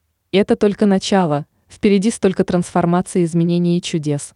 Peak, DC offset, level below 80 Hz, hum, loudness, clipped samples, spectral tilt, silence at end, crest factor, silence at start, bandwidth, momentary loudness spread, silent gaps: -4 dBFS; under 0.1%; -50 dBFS; none; -17 LUFS; under 0.1%; -6.5 dB/octave; 0.1 s; 12 dB; 0.35 s; 11 kHz; 5 LU; none